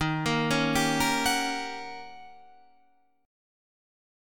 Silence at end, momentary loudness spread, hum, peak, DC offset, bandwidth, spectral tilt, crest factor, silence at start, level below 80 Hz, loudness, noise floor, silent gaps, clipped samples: 1 s; 16 LU; none; -12 dBFS; 0.3%; 19 kHz; -3.5 dB/octave; 18 dB; 0 s; -52 dBFS; -26 LUFS; -67 dBFS; none; under 0.1%